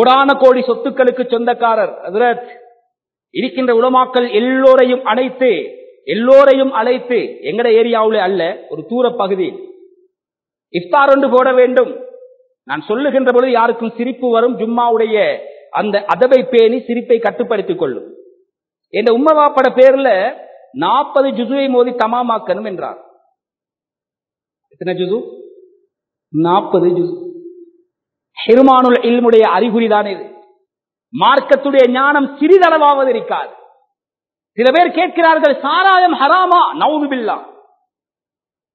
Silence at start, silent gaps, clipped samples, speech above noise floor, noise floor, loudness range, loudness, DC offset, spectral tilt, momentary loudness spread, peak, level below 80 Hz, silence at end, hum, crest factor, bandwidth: 0 s; none; 0.2%; over 78 dB; under -90 dBFS; 6 LU; -12 LUFS; under 0.1%; -7 dB/octave; 13 LU; 0 dBFS; -66 dBFS; 1.25 s; none; 14 dB; 5.6 kHz